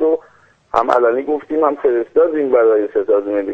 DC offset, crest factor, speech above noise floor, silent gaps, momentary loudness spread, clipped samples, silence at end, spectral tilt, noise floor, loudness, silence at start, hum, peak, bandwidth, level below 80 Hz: under 0.1%; 16 dB; 35 dB; none; 6 LU; under 0.1%; 0 s; -6.5 dB/octave; -50 dBFS; -16 LUFS; 0 s; none; 0 dBFS; 7.6 kHz; -52 dBFS